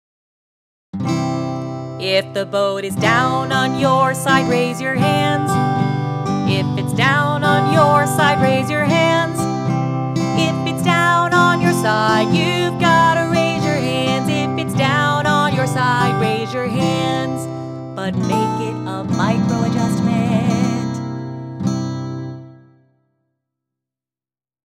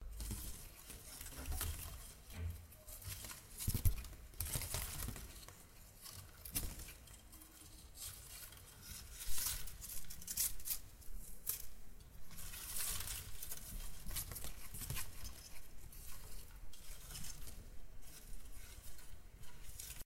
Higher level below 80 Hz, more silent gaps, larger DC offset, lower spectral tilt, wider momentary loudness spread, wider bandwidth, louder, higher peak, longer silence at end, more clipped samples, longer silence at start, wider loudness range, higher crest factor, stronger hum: about the same, -54 dBFS vs -52 dBFS; neither; neither; first, -5.5 dB/octave vs -2.5 dB/octave; second, 10 LU vs 17 LU; about the same, 15 kHz vs 16.5 kHz; first, -17 LUFS vs -46 LUFS; first, 0 dBFS vs -18 dBFS; first, 2.15 s vs 0 s; neither; first, 0.95 s vs 0 s; second, 5 LU vs 11 LU; second, 18 dB vs 26 dB; neither